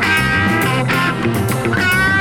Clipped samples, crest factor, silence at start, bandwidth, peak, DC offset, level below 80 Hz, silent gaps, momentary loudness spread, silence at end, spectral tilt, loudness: under 0.1%; 12 dB; 0 s; 18.5 kHz; -4 dBFS; 0.1%; -36 dBFS; none; 4 LU; 0 s; -5 dB/octave; -15 LUFS